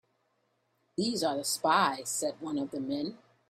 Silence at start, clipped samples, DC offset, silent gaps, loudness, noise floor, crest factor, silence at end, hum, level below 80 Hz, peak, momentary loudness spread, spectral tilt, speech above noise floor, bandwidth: 1 s; under 0.1%; under 0.1%; none; -31 LUFS; -75 dBFS; 20 dB; 0.35 s; none; -74 dBFS; -12 dBFS; 10 LU; -3 dB/octave; 44 dB; 16 kHz